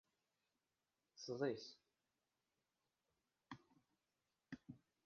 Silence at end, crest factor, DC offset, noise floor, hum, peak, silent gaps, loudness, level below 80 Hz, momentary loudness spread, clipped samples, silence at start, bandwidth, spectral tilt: 0.3 s; 24 dB; under 0.1%; under -90 dBFS; none; -30 dBFS; none; -50 LUFS; -88 dBFS; 20 LU; under 0.1%; 1.15 s; 7 kHz; -4.5 dB/octave